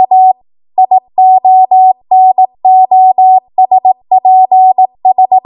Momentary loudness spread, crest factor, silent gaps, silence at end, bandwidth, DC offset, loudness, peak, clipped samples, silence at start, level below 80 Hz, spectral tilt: 4 LU; 6 dB; none; 0.05 s; 1.1 kHz; under 0.1%; -7 LUFS; 0 dBFS; under 0.1%; 0 s; -66 dBFS; -9.5 dB/octave